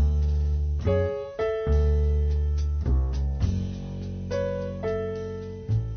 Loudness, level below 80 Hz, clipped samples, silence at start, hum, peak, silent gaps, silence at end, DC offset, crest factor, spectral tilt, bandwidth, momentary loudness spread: -27 LUFS; -26 dBFS; under 0.1%; 0 s; none; -12 dBFS; none; 0 s; under 0.1%; 12 dB; -8.5 dB/octave; 6.6 kHz; 9 LU